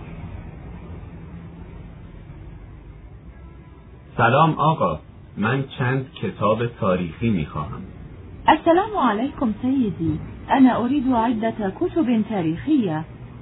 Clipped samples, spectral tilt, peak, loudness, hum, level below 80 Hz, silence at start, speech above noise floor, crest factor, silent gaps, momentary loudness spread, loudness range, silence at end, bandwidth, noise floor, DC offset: under 0.1%; -11 dB/octave; -2 dBFS; -21 LUFS; none; -44 dBFS; 0 s; 23 dB; 20 dB; none; 23 LU; 19 LU; 0 s; 4.1 kHz; -43 dBFS; under 0.1%